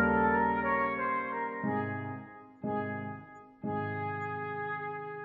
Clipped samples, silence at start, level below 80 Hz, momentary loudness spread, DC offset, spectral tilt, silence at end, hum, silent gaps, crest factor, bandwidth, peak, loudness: under 0.1%; 0 s; -60 dBFS; 14 LU; under 0.1%; -6 dB/octave; 0 s; none; none; 18 dB; 4.8 kHz; -16 dBFS; -33 LUFS